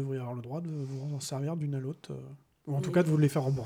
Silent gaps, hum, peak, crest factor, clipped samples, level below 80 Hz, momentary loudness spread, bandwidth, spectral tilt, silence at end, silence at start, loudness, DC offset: none; none; -14 dBFS; 16 dB; under 0.1%; -68 dBFS; 17 LU; 16 kHz; -7 dB/octave; 0 s; 0 s; -32 LUFS; under 0.1%